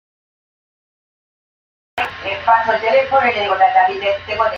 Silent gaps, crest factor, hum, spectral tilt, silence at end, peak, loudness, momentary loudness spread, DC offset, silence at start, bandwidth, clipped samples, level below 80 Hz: none; 16 dB; none; -4.5 dB/octave; 0 s; -2 dBFS; -16 LUFS; 10 LU; under 0.1%; 1.95 s; 7 kHz; under 0.1%; -54 dBFS